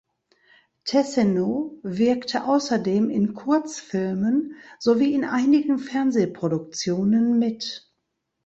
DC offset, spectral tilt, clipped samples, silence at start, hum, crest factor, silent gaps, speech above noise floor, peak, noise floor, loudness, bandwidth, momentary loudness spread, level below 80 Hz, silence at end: under 0.1%; -6 dB/octave; under 0.1%; 0.85 s; none; 16 dB; none; 56 dB; -8 dBFS; -78 dBFS; -23 LUFS; 8.2 kHz; 9 LU; -64 dBFS; 0.7 s